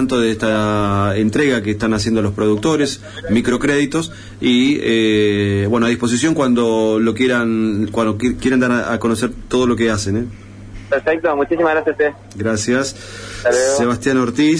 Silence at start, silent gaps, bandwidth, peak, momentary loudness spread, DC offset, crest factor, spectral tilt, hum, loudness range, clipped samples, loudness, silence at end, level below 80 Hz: 0 s; none; 11 kHz; -6 dBFS; 6 LU; under 0.1%; 10 dB; -5 dB/octave; none; 3 LU; under 0.1%; -16 LUFS; 0 s; -40 dBFS